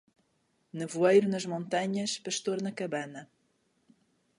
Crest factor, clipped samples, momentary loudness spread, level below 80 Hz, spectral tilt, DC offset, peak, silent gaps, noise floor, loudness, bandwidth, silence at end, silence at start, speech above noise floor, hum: 20 dB; under 0.1%; 17 LU; -80 dBFS; -4.5 dB/octave; under 0.1%; -12 dBFS; none; -74 dBFS; -30 LUFS; 11.5 kHz; 1.15 s; 0.75 s; 44 dB; none